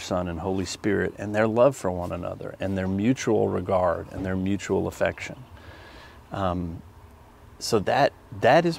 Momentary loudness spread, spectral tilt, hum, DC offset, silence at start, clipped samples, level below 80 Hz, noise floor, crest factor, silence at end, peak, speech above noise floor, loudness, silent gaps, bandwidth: 16 LU; -6 dB/octave; none; under 0.1%; 0 s; under 0.1%; -52 dBFS; -49 dBFS; 20 dB; 0 s; -6 dBFS; 25 dB; -25 LUFS; none; 16 kHz